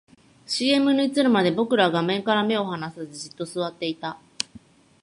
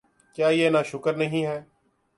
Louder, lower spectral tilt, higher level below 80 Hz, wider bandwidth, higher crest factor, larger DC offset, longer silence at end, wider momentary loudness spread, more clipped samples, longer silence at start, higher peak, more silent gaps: about the same, -23 LUFS vs -24 LUFS; second, -4.5 dB/octave vs -6 dB/octave; about the same, -68 dBFS vs -66 dBFS; about the same, 11.5 kHz vs 11.5 kHz; first, 22 dB vs 16 dB; neither; about the same, 0.45 s vs 0.55 s; about the same, 14 LU vs 12 LU; neither; first, 0.5 s vs 0.35 s; first, -2 dBFS vs -10 dBFS; neither